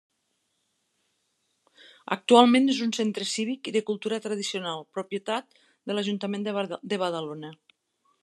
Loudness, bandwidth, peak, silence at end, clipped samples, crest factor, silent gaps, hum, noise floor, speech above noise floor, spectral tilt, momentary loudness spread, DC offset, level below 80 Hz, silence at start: -26 LUFS; 12 kHz; -2 dBFS; 0.7 s; under 0.1%; 26 dB; none; none; -76 dBFS; 50 dB; -4 dB/octave; 15 LU; under 0.1%; -86 dBFS; 2.1 s